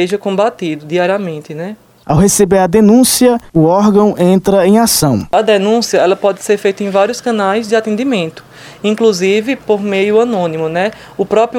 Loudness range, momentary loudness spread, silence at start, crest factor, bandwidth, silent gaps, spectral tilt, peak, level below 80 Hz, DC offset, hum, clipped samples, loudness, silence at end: 5 LU; 9 LU; 0 s; 12 dB; 16.5 kHz; none; -5 dB/octave; 0 dBFS; -40 dBFS; under 0.1%; none; under 0.1%; -12 LUFS; 0 s